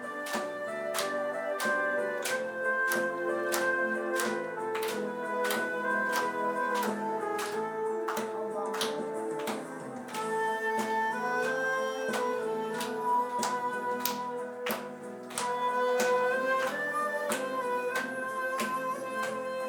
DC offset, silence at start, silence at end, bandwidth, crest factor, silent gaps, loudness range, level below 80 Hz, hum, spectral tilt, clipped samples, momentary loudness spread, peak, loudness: under 0.1%; 0 s; 0 s; over 20 kHz; 24 dB; none; 3 LU; -84 dBFS; none; -2.5 dB/octave; under 0.1%; 6 LU; -8 dBFS; -31 LUFS